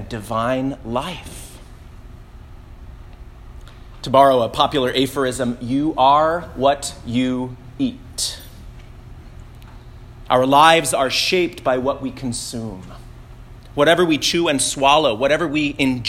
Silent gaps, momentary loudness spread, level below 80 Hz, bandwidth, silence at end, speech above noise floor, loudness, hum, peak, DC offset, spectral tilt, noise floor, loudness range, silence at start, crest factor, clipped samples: none; 16 LU; -42 dBFS; 16.5 kHz; 0 s; 21 dB; -18 LUFS; none; 0 dBFS; under 0.1%; -4 dB/octave; -39 dBFS; 10 LU; 0 s; 20 dB; under 0.1%